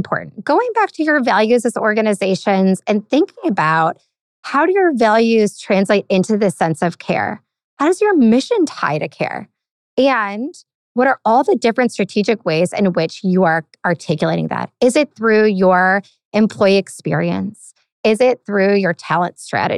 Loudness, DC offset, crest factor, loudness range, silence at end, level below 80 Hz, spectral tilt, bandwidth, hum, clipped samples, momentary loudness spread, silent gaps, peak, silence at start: -16 LUFS; under 0.1%; 14 dB; 2 LU; 0 s; -64 dBFS; -6 dB/octave; 12.5 kHz; none; under 0.1%; 9 LU; 4.21-4.43 s, 7.64-7.77 s, 9.71-9.97 s, 10.75-10.95 s, 16.25-16.31 s, 17.92-18.04 s; -2 dBFS; 0 s